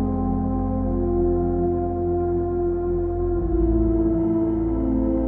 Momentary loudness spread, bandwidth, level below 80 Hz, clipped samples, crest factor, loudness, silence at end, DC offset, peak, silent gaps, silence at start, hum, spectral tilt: 3 LU; 2.3 kHz; -28 dBFS; under 0.1%; 12 dB; -23 LUFS; 0 s; under 0.1%; -10 dBFS; none; 0 s; none; -13.5 dB/octave